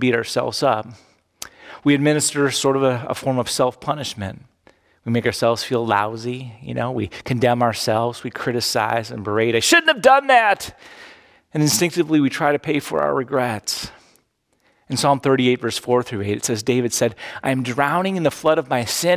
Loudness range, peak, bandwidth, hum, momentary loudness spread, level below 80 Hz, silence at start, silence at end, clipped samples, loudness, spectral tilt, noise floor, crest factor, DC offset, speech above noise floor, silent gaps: 5 LU; -2 dBFS; 16 kHz; none; 12 LU; -54 dBFS; 0 s; 0 s; under 0.1%; -19 LUFS; -4 dB/octave; -65 dBFS; 18 dB; under 0.1%; 46 dB; none